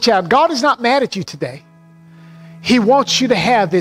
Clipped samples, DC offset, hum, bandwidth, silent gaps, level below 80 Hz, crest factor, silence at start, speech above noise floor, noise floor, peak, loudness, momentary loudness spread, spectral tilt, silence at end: under 0.1%; under 0.1%; none; 15.5 kHz; none; -52 dBFS; 14 dB; 0 s; 29 dB; -44 dBFS; -2 dBFS; -14 LUFS; 13 LU; -4 dB/octave; 0 s